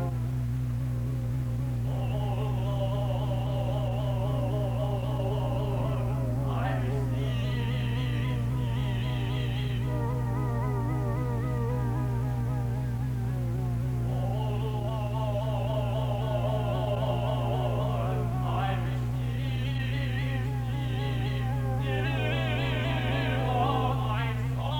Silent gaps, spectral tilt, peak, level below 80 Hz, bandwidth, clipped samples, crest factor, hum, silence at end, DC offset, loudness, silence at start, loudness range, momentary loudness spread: none; -7.5 dB/octave; -14 dBFS; -38 dBFS; 17 kHz; under 0.1%; 14 dB; none; 0 s; under 0.1%; -30 LUFS; 0 s; 1 LU; 3 LU